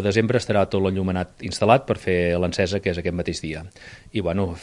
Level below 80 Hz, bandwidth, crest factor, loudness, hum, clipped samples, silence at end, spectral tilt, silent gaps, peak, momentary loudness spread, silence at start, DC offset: -48 dBFS; 11.5 kHz; 20 dB; -23 LUFS; none; under 0.1%; 0 s; -6 dB/octave; none; -2 dBFS; 11 LU; 0 s; under 0.1%